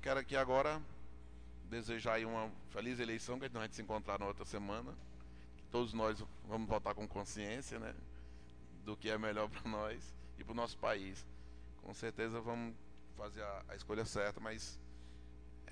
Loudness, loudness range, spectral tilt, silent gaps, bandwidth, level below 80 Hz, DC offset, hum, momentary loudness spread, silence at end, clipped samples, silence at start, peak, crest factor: -43 LUFS; 3 LU; -5 dB/octave; none; 10 kHz; -56 dBFS; 0.1%; none; 19 LU; 0 s; under 0.1%; 0 s; -22 dBFS; 22 dB